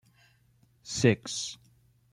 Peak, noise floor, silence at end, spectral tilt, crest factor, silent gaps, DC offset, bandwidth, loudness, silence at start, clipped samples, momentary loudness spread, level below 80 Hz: -8 dBFS; -65 dBFS; 0.55 s; -4.5 dB/octave; 24 dB; none; under 0.1%; 12.5 kHz; -29 LUFS; 0.85 s; under 0.1%; 24 LU; -64 dBFS